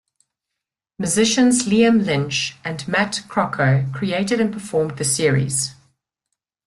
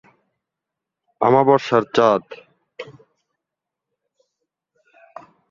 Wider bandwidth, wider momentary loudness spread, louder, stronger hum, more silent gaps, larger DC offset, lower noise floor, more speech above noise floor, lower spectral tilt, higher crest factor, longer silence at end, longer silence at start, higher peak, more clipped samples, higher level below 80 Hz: first, 12.5 kHz vs 7.4 kHz; second, 8 LU vs 23 LU; about the same, -19 LUFS vs -17 LUFS; neither; neither; neither; about the same, -83 dBFS vs -84 dBFS; second, 64 dB vs 68 dB; second, -4.5 dB/octave vs -6.5 dB/octave; second, 16 dB vs 22 dB; second, 0.95 s vs 2.65 s; second, 1 s vs 1.2 s; about the same, -4 dBFS vs -2 dBFS; neither; first, -56 dBFS vs -64 dBFS